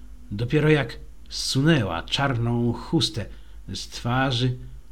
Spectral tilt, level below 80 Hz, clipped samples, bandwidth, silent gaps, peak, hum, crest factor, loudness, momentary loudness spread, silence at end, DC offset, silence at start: -5.5 dB/octave; -42 dBFS; under 0.1%; 15 kHz; none; -8 dBFS; none; 18 dB; -24 LUFS; 15 LU; 0.1 s; 0.8%; 0 s